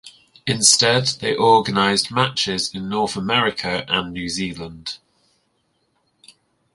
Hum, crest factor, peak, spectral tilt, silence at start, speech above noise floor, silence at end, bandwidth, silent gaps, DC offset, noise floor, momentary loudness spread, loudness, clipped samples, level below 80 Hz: none; 22 dB; 0 dBFS; -2.5 dB/octave; 0.05 s; 48 dB; 1.8 s; 11.5 kHz; none; under 0.1%; -67 dBFS; 17 LU; -18 LUFS; under 0.1%; -52 dBFS